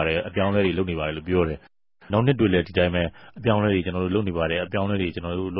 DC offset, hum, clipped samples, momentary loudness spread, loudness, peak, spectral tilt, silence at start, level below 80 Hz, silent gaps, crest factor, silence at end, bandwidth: 0.2%; none; under 0.1%; 7 LU; -24 LUFS; -6 dBFS; -11.5 dB/octave; 0 s; -40 dBFS; none; 18 dB; 0 s; 5.6 kHz